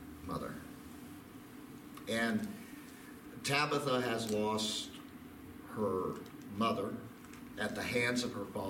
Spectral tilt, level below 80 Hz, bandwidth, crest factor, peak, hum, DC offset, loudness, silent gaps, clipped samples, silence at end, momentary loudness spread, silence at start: -4 dB/octave; -66 dBFS; 17 kHz; 22 dB; -16 dBFS; none; under 0.1%; -36 LUFS; none; under 0.1%; 0 s; 18 LU; 0 s